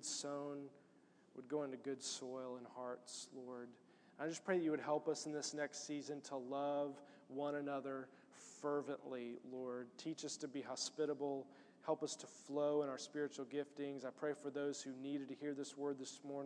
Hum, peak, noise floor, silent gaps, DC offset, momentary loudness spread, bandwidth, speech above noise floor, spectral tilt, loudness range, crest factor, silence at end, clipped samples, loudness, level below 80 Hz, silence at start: none; -26 dBFS; -70 dBFS; none; under 0.1%; 11 LU; 10.5 kHz; 25 dB; -3.5 dB/octave; 5 LU; 20 dB; 0 s; under 0.1%; -45 LUFS; under -90 dBFS; 0 s